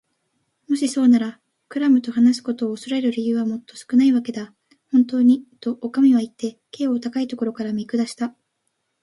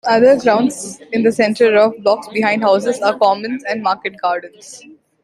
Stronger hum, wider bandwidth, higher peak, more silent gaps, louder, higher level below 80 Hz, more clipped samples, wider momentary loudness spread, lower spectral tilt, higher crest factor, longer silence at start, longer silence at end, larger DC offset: neither; about the same, 11.5 kHz vs 12.5 kHz; second, -6 dBFS vs -2 dBFS; neither; second, -21 LUFS vs -15 LUFS; second, -70 dBFS vs -62 dBFS; neither; about the same, 13 LU vs 11 LU; about the same, -5.5 dB/octave vs -4.5 dB/octave; about the same, 14 dB vs 14 dB; first, 0.7 s vs 0.05 s; first, 0.75 s vs 0.45 s; neither